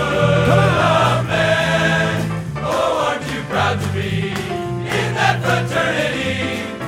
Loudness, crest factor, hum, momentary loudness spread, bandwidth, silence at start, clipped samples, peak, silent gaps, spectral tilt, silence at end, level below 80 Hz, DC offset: -17 LUFS; 16 dB; none; 9 LU; 16 kHz; 0 s; under 0.1%; -2 dBFS; none; -5.5 dB/octave; 0 s; -40 dBFS; under 0.1%